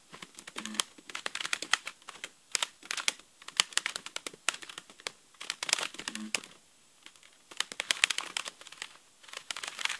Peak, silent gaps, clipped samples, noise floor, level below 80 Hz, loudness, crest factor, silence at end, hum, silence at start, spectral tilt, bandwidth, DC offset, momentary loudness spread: 0 dBFS; none; under 0.1%; -62 dBFS; -78 dBFS; -33 LUFS; 38 dB; 0 s; none; 0.1 s; 1 dB/octave; 12 kHz; under 0.1%; 18 LU